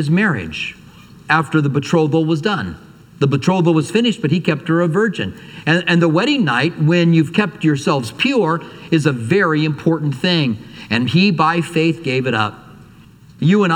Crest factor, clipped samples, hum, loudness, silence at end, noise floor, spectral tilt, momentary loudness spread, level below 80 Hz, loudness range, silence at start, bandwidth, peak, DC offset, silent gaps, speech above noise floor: 16 dB; under 0.1%; none; -16 LUFS; 0 s; -43 dBFS; -6.5 dB/octave; 7 LU; -54 dBFS; 2 LU; 0 s; 11.5 kHz; 0 dBFS; under 0.1%; none; 27 dB